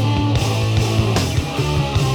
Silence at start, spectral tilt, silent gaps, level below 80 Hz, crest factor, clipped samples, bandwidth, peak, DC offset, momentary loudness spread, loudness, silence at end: 0 s; -5.5 dB/octave; none; -30 dBFS; 14 dB; under 0.1%; 17.5 kHz; -4 dBFS; under 0.1%; 3 LU; -18 LUFS; 0 s